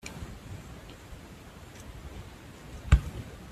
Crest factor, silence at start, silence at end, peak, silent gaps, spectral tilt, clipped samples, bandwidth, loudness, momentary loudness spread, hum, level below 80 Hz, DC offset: 26 dB; 0 s; 0 s; -6 dBFS; none; -6 dB/octave; under 0.1%; 14 kHz; -33 LUFS; 21 LU; none; -36 dBFS; under 0.1%